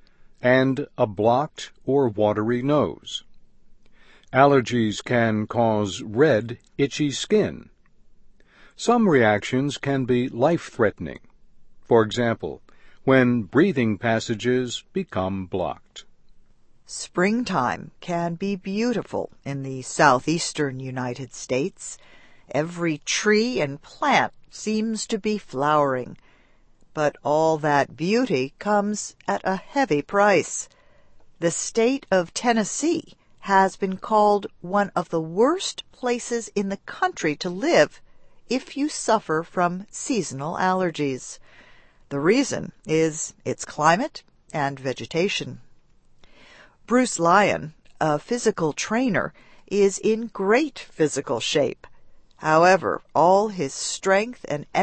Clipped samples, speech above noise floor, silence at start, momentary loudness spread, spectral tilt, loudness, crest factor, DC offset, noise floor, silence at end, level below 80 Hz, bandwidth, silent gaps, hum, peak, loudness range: under 0.1%; 33 dB; 0.45 s; 12 LU; -4.5 dB/octave; -23 LUFS; 22 dB; under 0.1%; -55 dBFS; 0 s; -56 dBFS; 8.8 kHz; none; none; -2 dBFS; 4 LU